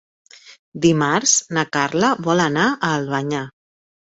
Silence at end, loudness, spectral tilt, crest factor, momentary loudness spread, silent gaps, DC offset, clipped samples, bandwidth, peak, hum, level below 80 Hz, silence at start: 0.55 s; -18 LUFS; -3.5 dB/octave; 18 dB; 10 LU; 0.59-0.72 s; under 0.1%; under 0.1%; 8 kHz; -2 dBFS; none; -58 dBFS; 0.45 s